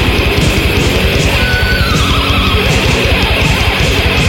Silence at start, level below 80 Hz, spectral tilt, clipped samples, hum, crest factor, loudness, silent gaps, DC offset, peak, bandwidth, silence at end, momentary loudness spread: 0 s; -16 dBFS; -4.5 dB/octave; under 0.1%; none; 10 dB; -10 LUFS; none; 0.5%; 0 dBFS; 16.5 kHz; 0 s; 1 LU